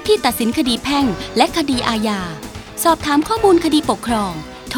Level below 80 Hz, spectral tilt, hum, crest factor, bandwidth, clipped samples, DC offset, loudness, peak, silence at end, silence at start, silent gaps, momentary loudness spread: -40 dBFS; -4 dB/octave; none; 18 dB; over 20 kHz; under 0.1%; under 0.1%; -17 LUFS; 0 dBFS; 0 s; 0 s; none; 11 LU